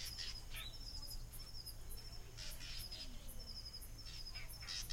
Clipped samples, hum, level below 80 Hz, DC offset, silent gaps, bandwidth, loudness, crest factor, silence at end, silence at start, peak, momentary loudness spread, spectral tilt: under 0.1%; none; -52 dBFS; under 0.1%; none; 16.5 kHz; -50 LUFS; 16 dB; 0 s; 0 s; -32 dBFS; 6 LU; -2 dB/octave